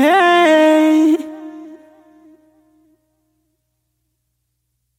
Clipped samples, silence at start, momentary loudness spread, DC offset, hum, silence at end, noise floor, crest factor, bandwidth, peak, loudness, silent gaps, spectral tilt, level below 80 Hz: under 0.1%; 0 s; 22 LU; under 0.1%; none; 3.25 s; -71 dBFS; 16 dB; 15.5 kHz; -2 dBFS; -12 LUFS; none; -3 dB/octave; -74 dBFS